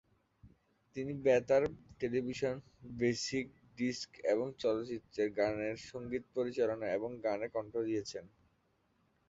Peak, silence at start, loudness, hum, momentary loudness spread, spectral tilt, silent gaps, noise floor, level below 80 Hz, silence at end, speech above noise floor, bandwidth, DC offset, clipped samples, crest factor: -16 dBFS; 0.45 s; -36 LUFS; none; 11 LU; -4.5 dB/octave; none; -76 dBFS; -66 dBFS; 1 s; 40 dB; 7.6 kHz; under 0.1%; under 0.1%; 20 dB